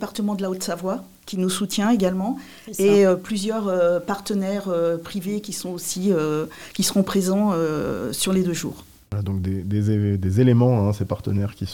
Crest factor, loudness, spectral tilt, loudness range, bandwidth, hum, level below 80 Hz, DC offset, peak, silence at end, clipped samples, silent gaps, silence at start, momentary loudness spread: 16 dB; -22 LUFS; -6 dB/octave; 2 LU; 17.5 kHz; none; -54 dBFS; 0.2%; -6 dBFS; 0 s; under 0.1%; none; 0 s; 11 LU